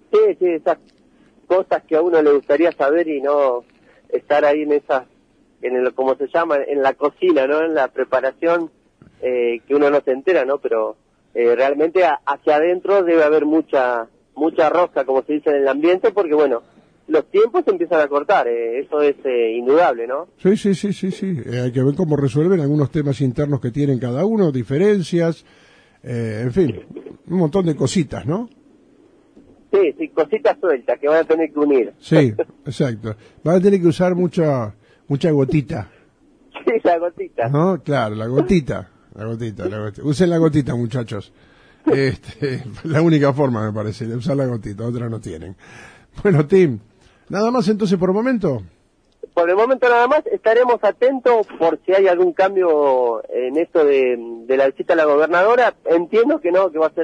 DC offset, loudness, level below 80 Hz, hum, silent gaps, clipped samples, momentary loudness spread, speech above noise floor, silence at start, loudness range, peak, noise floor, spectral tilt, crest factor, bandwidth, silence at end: under 0.1%; -18 LUFS; -52 dBFS; none; none; under 0.1%; 11 LU; 37 dB; 0.1 s; 4 LU; -2 dBFS; -54 dBFS; -7.5 dB/octave; 16 dB; 10.5 kHz; 0 s